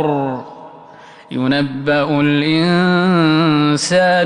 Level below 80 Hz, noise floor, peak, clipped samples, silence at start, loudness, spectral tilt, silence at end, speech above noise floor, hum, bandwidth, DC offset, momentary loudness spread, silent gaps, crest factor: -54 dBFS; -40 dBFS; -4 dBFS; under 0.1%; 0 s; -14 LUFS; -5.5 dB/octave; 0 s; 26 dB; none; 11 kHz; under 0.1%; 10 LU; none; 12 dB